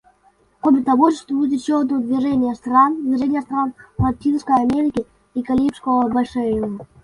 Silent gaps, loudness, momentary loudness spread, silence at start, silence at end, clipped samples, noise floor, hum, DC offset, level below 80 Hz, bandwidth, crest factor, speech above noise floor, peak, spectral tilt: none; -19 LUFS; 8 LU; 0.65 s; 0.2 s; under 0.1%; -57 dBFS; none; under 0.1%; -44 dBFS; 11 kHz; 16 dB; 39 dB; -2 dBFS; -7.5 dB/octave